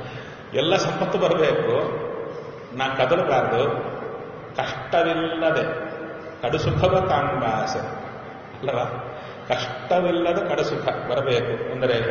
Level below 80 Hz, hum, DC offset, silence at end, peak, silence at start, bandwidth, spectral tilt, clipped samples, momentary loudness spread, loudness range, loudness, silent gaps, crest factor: -50 dBFS; none; under 0.1%; 0 s; -6 dBFS; 0 s; 7 kHz; -4 dB/octave; under 0.1%; 14 LU; 3 LU; -23 LUFS; none; 18 dB